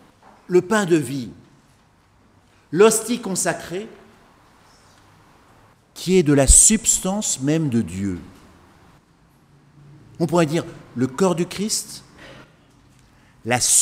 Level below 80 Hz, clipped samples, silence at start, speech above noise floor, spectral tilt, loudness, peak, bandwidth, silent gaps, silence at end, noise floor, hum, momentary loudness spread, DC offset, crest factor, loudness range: -34 dBFS; under 0.1%; 0.5 s; 37 dB; -3.5 dB/octave; -18 LUFS; 0 dBFS; 16 kHz; none; 0 s; -56 dBFS; none; 19 LU; under 0.1%; 22 dB; 9 LU